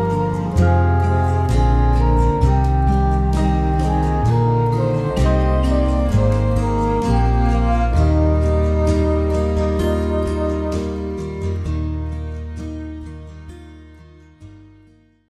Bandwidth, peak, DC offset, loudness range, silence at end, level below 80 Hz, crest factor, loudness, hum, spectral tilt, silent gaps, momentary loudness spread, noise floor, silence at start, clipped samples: 10.5 kHz; -2 dBFS; under 0.1%; 11 LU; 0.75 s; -22 dBFS; 14 dB; -18 LUFS; none; -8.5 dB/octave; none; 11 LU; -51 dBFS; 0 s; under 0.1%